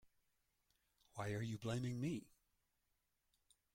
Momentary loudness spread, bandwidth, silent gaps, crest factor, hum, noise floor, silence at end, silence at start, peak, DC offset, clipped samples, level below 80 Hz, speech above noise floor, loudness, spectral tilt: 7 LU; 16.5 kHz; none; 18 dB; none; -86 dBFS; 1.5 s; 1.15 s; -32 dBFS; under 0.1%; under 0.1%; -74 dBFS; 42 dB; -45 LUFS; -6.5 dB/octave